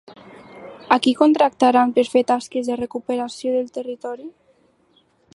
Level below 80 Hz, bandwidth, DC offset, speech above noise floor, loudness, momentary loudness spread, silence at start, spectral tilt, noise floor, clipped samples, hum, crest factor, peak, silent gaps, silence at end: -64 dBFS; 11.5 kHz; under 0.1%; 41 dB; -19 LUFS; 20 LU; 0.55 s; -4 dB/octave; -60 dBFS; under 0.1%; none; 20 dB; 0 dBFS; none; 1.05 s